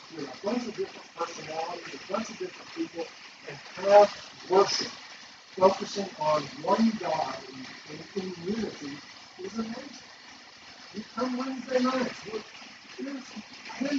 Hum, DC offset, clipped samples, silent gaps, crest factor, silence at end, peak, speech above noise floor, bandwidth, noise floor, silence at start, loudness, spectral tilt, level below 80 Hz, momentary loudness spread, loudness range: none; under 0.1%; under 0.1%; none; 24 dB; 0 s; -6 dBFS; 21 dB; 7.8 kHz; -50 dBFS; 0 s; -29 LUFS; -4 dB/octave; -70 dBFS; 20 LU; 11 LU